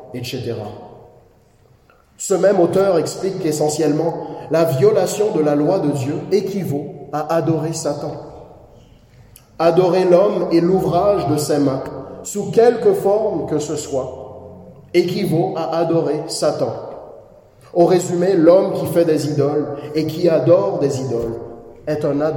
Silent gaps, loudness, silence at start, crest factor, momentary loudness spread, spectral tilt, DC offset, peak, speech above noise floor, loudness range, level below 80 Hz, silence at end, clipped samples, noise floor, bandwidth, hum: none; -17 LUFS; 0 s; 18 dB; 14 LU; -6 dB/octave; under 0.1%; 0 dBFS; 36 dB; 4 LU; -52 dBFS; 0 s; under 0.1%; -52 dBFS; 17 kHz; none